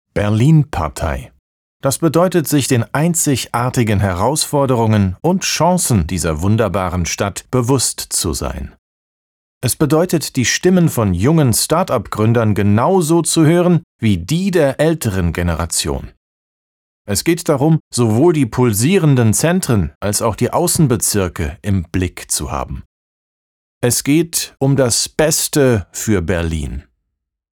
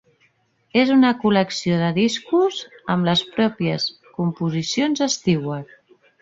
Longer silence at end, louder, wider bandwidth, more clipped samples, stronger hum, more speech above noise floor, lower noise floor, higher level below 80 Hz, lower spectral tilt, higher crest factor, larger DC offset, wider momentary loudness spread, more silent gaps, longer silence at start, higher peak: first, 0.75 s vs 0.6 s; first, -15 LUFS vs -20 LUFS; first, 20 kHz vs 8 kHz; neither; neither; first, 60 dB vs 43 dB; first, -75 dBFS vs -62 dBFS; first, -34 dBFS vs -58 dBFS; about the same, -5 dB/octave vs -5 dB/octave; second, 12 dB vs 18 dB; neither; about the same, 8 LU vs 9 LU; first, 1.39-1.80 s, 8.79-9.61 s, 13.83-13.99 s, 16.17-17.05 s, 17.80-17.91 s, 19.95-20.01 s, 22.86-23.81 s vs none; second, 0.15 s vs 0.75 s; about the same, -2 dBFS vs -4 dBFS